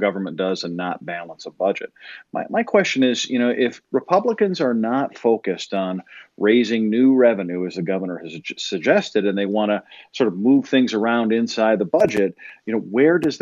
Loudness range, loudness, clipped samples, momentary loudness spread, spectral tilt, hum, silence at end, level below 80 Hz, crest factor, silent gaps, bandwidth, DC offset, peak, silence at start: 3 LU; -20 LUFS; under 0.1%; 12 LU; -5.5 dB/octave; none; 0.05 s; -68 dBFS; 18 dB; none; 7.6 kHz; under 0.1%; -2 dBFS; 0 s